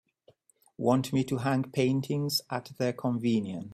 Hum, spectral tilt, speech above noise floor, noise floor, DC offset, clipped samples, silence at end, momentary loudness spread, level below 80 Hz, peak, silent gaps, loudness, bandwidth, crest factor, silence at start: none; -6 dB/octave; 37 dB; -65 dBFS; under 0.1%; under 0.1%; 0 s; 4 LU; -66 dBFS; -10 dBFS; none; -29 LUFS; 15 kHz; 18 dB; 0.8 s